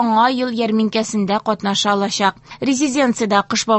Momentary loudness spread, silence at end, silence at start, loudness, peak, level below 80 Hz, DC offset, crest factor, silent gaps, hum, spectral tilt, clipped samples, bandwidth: 4 LU; 0 s; 0 s; -17 LUFS; 0 dBFS; -58 dBFS; under 0.1%; 16 dB; none; none; -3.5 dB/octave; under 0.1%; 8.6 kHz